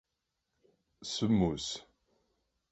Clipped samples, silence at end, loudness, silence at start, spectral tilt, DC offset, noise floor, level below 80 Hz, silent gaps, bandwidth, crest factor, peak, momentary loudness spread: under 0.1%; 0.9 s; -32 LUFS; 1 s; -5.5 dB/octave; under 0.1%; -85 dBFS; -56 dBFS; none; 8.4 kHz; 20 dB; -16 dBFS; 15 LU